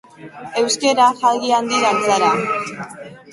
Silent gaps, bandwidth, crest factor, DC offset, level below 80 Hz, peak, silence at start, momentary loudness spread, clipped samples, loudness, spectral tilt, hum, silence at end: none; 11.5 kHz; 16 dB; under 0.1%; -62 dBFS; -2 dBFS; 0.2 s; 18 LU; under 0.1%; -16 LUFS; -2.5 dB/octave; none; 0.15 s